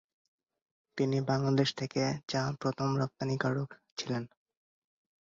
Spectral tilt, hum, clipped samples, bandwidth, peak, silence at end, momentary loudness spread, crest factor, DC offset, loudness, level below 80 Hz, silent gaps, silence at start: -6 dB/octave; none; under 0.1%; 7.6 kHz; -14 dBFS; 0.95 s; 10 LU; 20 dB; under 0.1%; -33 LUFS; -68 dBFS; 3.92-3.96 s; 0.95 s